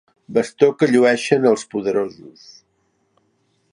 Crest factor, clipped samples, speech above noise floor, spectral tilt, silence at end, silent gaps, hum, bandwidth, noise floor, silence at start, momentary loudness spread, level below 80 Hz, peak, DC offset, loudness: 18 dB; under 0.1%; 48 dB; -5.5 dB/octave; 1.45 s; none; none; 11 kHz; -66 dBFS; 0.3 s; 8 LU; -66 dBFS; -2 dBFS; under 0.1%; -18 LUFS